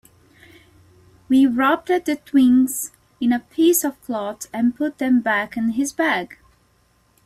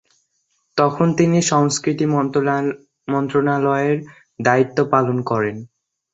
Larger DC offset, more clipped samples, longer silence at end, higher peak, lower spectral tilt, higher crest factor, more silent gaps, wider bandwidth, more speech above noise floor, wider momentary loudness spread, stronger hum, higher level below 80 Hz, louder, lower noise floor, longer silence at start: neither; neither; first, 0.9 s vs 0.5 s; second, -6 dBFS vs -2 dBFS; second, -3.5 dB/octave vs -5.5 dB/octave; about the same, 14 dB vs 18 dB; neither; first, 16 kHz vs 8.2 kHz; second, 41 dB vs 50 dB; about the same, 11 LU vs 9 LU; neither; about the same, -58 dBFS vs -58 dBFS; about the same, -20 LUFS vs -18 LUFS; second, -60 dBFS vs -68 dBFS; first, 1.3 s vs 0.75 s